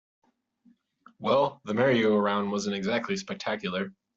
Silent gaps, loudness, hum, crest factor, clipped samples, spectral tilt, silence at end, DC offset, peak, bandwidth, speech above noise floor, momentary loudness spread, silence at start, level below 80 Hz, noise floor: none; -27 LUFS; none; 18 dB; under 0.1%; -4 dB/octave; 0.25 s; under 0.1%; -10 dBFS; 8 kHz; 37 dB; 9 LU; 1.2 s; -70 dBFS; -64 dBFS